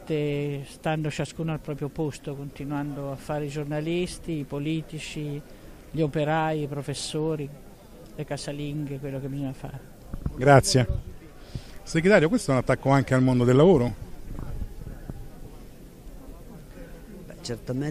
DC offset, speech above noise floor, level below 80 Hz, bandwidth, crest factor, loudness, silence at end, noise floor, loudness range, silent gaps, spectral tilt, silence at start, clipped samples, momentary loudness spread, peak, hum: under 0.1%; 21 dB; -42 dBFS; 15 kHz; 22 dB; -26 LUFS; 0 s; -46 dBFS; 11 LU; none; -6 dB/octave; 0 s; under 0.1%; 25 LU; -4 dBFS; none